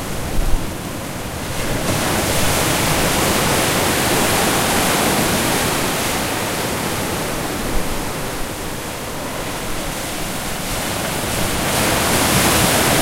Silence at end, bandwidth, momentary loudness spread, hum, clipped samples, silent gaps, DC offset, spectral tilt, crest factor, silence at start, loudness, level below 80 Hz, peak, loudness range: 0 s; 16 kHz; 10 LU; none; under 0.1%; none; under 0.1%; -3 dB/octave; 16 dB; 0 s; -18 LUFS; -30 dBFS; -2 dBFS; 8 LU